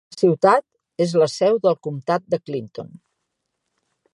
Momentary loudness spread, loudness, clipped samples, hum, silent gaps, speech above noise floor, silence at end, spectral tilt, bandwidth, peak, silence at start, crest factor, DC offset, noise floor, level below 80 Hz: 19 LU; -20 LUFS; under 0.1%; none; none; 58 dB; 1.3 s; -6 dB/octave; 11.5 kHz; -2 dBFS; 0.15 s; 20 dB; under 0.1%; -77 dBFS; -70 dBFS